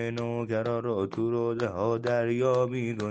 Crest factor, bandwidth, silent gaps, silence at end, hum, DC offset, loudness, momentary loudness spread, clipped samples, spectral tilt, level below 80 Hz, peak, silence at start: 14 dB; 8.6 kHz; none; 0 s; none; under 0.1%; -28 LUFS; 5 LU; under 0.1%; -7.5 dB/octave; -66 dBFS; -14 dBFS; 0 s